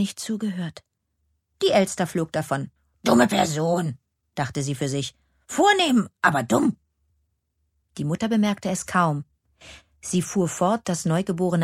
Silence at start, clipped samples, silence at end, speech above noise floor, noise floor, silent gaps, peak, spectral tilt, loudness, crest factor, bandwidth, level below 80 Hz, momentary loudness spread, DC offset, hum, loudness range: 0 s; under 0.1%; 0 s; 51 dB; -73 dBFS; none; -4 dBFS; -5 dB/octave; -23 LUFS; 20 dB; 15.5 kHz; -60 dBFS; 13 LU; under 0.1%; none; 4 LU